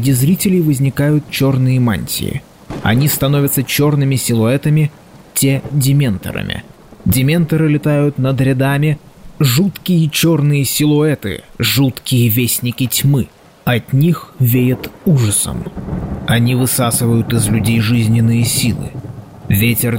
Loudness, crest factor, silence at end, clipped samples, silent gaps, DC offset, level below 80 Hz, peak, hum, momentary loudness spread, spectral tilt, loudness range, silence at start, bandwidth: -14 LUFS; 12 dB; 0 s; under 0.1%; none; 0.2%; -40 dBFS; -2 dBFS; none; 10 LU; -5.5 dB/octave; 2 LU; 0 s; 16.5 kHz